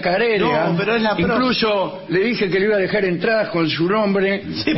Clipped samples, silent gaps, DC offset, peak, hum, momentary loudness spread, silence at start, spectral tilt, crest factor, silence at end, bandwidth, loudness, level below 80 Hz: under 0.1%; none; under 0.1%; -6 dBFS; none; 3 LU; 0 s; -9 dB/octave; 12 dB; 0 s; 6 kHz; -18 LUFS; -48 dBFS